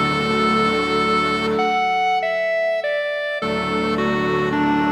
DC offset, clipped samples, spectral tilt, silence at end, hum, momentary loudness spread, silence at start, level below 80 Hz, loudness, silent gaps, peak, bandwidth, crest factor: under 0.1%; under 0.1%; -5.5 dB/octave; 0 s; none; 4 LU; 0 s; -46 dBFS; -19 LUFS; none; -6 dBFS; 18.5 kHz; 12 dB